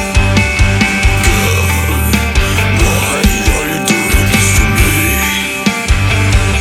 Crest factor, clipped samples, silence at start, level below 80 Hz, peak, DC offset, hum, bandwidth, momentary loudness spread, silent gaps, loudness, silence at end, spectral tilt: 10 dB; under 0.1%; 0 s; -16 dBFS; 0 dBFS; under 0.1%; none; 17 kHz; 3 LU; none; -11 LUFS; 0 s; -4 dB/octave